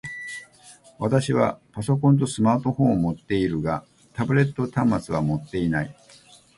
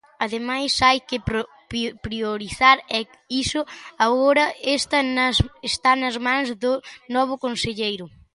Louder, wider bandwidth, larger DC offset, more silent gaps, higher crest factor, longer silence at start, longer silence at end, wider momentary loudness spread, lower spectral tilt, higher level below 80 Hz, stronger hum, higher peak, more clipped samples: about the same, -23 LUFS vs -21 LUFS; about the same, 11.5 kHz vs 11.5 kHz; neither; neither; about the same, 18 dB vs 20 dB; second, 0.05 s vs 0.2 s; first, 0.65 s vs 0.25 s; about the same, 12 LU vs 10 LU; first, -7 dB/octave vs -3.5 dB/octave; second, -50 dBFS vs -42 dBFS; neither; second, -6 dBFS vs -2 dBFS; neither